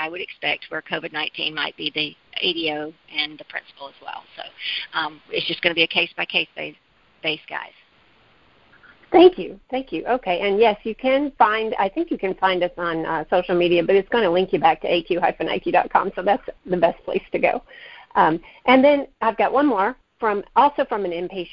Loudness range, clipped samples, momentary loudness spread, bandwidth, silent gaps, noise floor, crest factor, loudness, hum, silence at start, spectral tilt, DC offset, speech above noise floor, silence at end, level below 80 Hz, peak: 6 LU; under 0.1%; 13 LU; 5.6 kHz; none; -57 dBFS; 20 dB; -21 LUFS; none; 0 s; -8.5 dB/octave; under 0.1%; 36 dB; 0.05 s; -56 dBFS; -2 dBFS